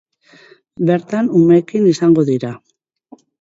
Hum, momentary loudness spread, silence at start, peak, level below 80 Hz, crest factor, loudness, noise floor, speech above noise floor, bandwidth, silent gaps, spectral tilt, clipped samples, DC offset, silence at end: none; 10 LU; 0.8 s; -2 dBFS; -60 dBFS; 14 dB; -14 LUFS; -47 dBFS; 34 dB; 7.8 kHz; none; -8 dB/octave; under 0.1%; under 0.1%; 0.85 s